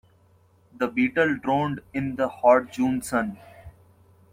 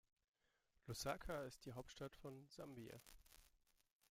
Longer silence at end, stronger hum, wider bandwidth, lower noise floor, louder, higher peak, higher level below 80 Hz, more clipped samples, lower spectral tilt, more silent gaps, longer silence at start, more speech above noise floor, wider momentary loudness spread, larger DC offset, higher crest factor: about the same, 0.65 s vs 0.55 s; neither; about the same, 16 kHz vs 16.5 kHz; second, -59 dBFS vs -84 dBFS; first, -24 LUFS vs -53 LUFS; first, -4 dBFS vs -32 dBFS; first, -58 dBFS vs -70 dBFS; neither; first, -6 dB/octave vs -4.5 dB/octave; neither; about the same, 0.75 s vs 0.85 s; first, 36 dB vs 31 dB; second, 11 LU vs 16 LU; neither; about the same, 20 dB vs 22 dB